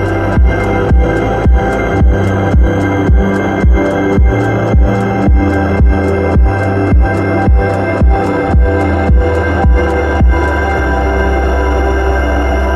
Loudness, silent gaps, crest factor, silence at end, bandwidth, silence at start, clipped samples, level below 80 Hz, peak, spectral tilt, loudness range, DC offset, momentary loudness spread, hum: -12 LUFS; none; 8 dB; 0 s; 7.4 kHz; 0 s; under 0.1%; -14 dBFS; 0 dBFS; -8 dB/octave; 1 LU; under 0.1%; 2 LU; none